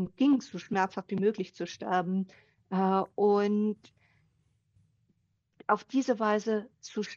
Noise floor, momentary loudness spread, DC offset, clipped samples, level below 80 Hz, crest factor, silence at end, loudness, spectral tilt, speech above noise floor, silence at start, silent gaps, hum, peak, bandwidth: -74 dBFS; 11 LU; under 0.1%; under 0.1%; -74 dBFS; 18 dB; 0 s; -30 LUFS; -6.5 dB/octave; 45 dB; 0 s; none; none; -12 dBFS; 7.4 kHz